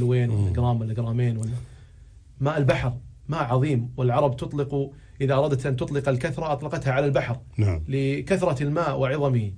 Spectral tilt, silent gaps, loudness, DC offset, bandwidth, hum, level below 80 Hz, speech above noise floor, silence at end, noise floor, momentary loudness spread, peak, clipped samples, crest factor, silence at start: -8 dB/octave; none; -25 LUFS; under 0.1%; 10.5 kHz; none; -44 dBFS; 24 dB; 0 s; -48 dBFS; 7 LU; -8 dBFS; under 0.1%; 16 dB; 0 s